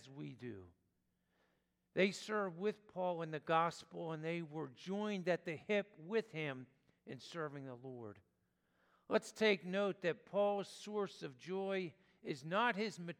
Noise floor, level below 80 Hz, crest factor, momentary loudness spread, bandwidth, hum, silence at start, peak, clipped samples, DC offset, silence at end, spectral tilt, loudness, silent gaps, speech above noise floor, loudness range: -83 dBFS; -88 dBFS; 22 dB; 15 LU; 14.5 kHz; none; 0 s; -20 dBFS; under 0.1%; under 0.1%; 0.05 s; -5.5 dB/octave; -40 LUFS; none; 42 dB; 5 LU